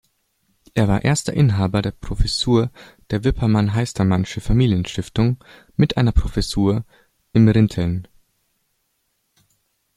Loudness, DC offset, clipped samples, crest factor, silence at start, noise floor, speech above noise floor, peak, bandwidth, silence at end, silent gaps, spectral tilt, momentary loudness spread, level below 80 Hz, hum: -20 LUFS; under 0.1%; under 0.1%; 18 dB; 0.75 s; -70 dBFS; 52 dB; -2 dBFS; 12.5 kHz; 1.95 s; none; -6.5 dB/octave; 9 LU; -30 dBFS; none